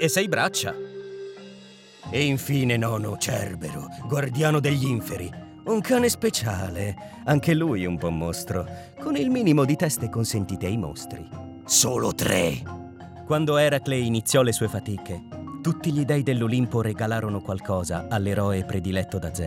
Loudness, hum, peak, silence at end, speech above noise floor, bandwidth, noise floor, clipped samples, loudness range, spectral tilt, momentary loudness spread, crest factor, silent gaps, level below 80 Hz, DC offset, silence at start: -24 LUFS; none; -6 dBFS; 0 s; 23 dB; 17 kHz; -47 dBFS; under 0.1%; 3 LU; -5 dB/octave; 16 LU; 18 dB; none; -54 dBFS; under 0.1%; 0 s